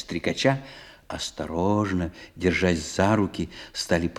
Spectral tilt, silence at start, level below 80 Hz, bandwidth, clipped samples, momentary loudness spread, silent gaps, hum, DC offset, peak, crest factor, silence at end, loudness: -5 dB/octave; 0 s; -50 dBFS; 14 kHz; under 0.1%; 11 LU; none; none; under 0.1%; -6 dBFS; 18 dB; 0 s; -26 LUFS